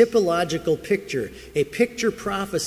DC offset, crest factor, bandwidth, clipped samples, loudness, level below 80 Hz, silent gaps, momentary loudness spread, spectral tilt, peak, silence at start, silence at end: under 0.1%; 18 dB; 16 kHz; under 0.1%; -24 LUFS; -50 dBFS; none; 7 LU; -4.5 dB/octave; -4 dBFS; 0 s; 0 s